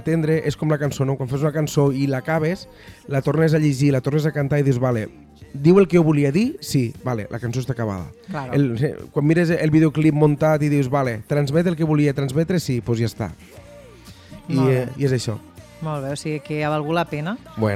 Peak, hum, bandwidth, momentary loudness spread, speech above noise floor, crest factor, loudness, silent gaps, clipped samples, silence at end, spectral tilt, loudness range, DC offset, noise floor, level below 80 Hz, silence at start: -2 dBFS; none; 14.5 kHz; 11 LU; 24 dB; 18 dB; -20 LUFS; none; under 0.1%; 0 s; -7.5 dB/octave; 5 LU; under 0.1%; -43 dBFS; -50 dBFS; 0 s